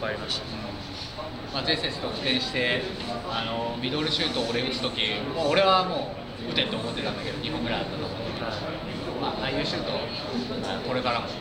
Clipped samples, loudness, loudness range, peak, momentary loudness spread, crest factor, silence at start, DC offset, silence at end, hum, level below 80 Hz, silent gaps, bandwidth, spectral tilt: under 0.1%; -27 LUFS; 5 LU; -8 dBFS; 9 LU; 20 dB; 0 s; under 0.1%; 0 s; none; -48 dBFS; none; 16.5 kHz; -4.5 dB/octave